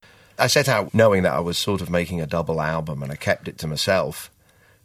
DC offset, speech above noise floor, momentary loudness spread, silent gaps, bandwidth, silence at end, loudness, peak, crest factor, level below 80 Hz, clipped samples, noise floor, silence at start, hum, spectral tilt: under 0.1%; 35 dB; 12 LU; none; 16 kHz; 0.6 s; -22 LUFS; 0 dBFS; 22 dB; -48 dBFS; under 0.1%; -57 dBFS; 0.4 s; none; -4.5 dB/octave